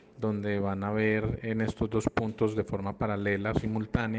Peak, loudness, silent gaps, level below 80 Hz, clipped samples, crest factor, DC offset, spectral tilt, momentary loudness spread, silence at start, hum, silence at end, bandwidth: -12 dBFS; -30 LUFS; none; -48 dBFS; under 0.1%; 18 dB; under 0.1%; -7.5 dB/octave; 4 LU; 0.15 s; none; 0 s; 9.4 kHz